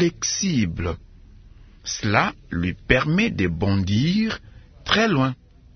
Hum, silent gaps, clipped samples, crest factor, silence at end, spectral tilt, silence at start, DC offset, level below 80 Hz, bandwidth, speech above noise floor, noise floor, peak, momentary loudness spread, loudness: none; none; under 0.1%; 22 dB; 0.4 s; -4.5 dB/octave; 0 s; under 0.1%; -42 dBFS; 6.6 kHz; 25 dB; -46 dBFS; 0 dBFS; 12 LU; -22 LUFS